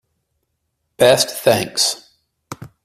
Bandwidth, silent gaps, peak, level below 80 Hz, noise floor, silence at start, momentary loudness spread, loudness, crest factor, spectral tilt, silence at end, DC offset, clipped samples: 16 kHz; none; 0 dBFS; -56 dBFS; -72 dBFS; 1 s; 23 LU; -15 LUFS; 18 dB; -2.5 dB/octave; 0.2 s; under 0.1%; under 0.1%